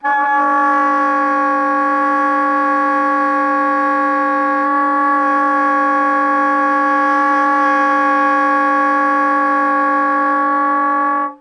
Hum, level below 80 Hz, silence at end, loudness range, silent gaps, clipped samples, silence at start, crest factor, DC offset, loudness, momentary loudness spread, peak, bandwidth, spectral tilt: none; -82 dBFS; 0.05 s; 1 LU; none; under 0.1%; 0.05 s; 10 dB; under 0.1%; -14 LUFS; 2 LU; -4 dBFS; 10 kHz; -3.5 dB/octave